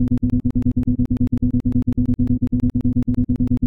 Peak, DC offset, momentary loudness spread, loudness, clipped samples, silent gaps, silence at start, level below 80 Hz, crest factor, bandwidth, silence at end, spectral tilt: -6 dBFS; 0.9%; 1 LU; -20 LUFS; under 0.1%; none; 0 s; -26 dBFS; 12 dB; 2.8 kHz; 0 s; -11.5 dB/octave